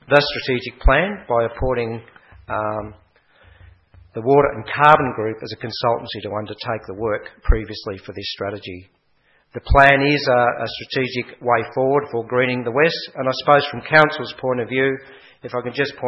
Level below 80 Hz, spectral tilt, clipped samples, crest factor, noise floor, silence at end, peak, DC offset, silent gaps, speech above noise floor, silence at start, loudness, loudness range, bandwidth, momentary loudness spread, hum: -30 dBFS; -7 dB/octave; under 0.1%; 20 dB; -61 dBFS; 0 s; 0 dBFS; under 0.1%; none; 42 dB; 0.1 s; -19 LUFS; 7 LU; 8 kHz; 15 LU; none